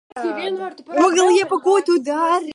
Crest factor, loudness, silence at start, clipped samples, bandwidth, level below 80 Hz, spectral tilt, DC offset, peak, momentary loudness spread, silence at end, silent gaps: 14 dB; -18 LUFS; 0.15 s; under 0.1%; 11.5 kHz; -76 dBFS; -2.5 dB/octave; under 0.1%; -2 dBFS; 11 LU; 0 s; none